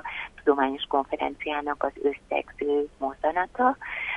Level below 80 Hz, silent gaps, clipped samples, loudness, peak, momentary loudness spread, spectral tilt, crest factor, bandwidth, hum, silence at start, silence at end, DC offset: -56 dBFS; none; under 0.1%; -27 LUFS; -8 dBFS; 7 LU; -5.5 dB/octave; 20 dB; 7.6 kHz; none; 0.05 s; 0 s; under 0.1%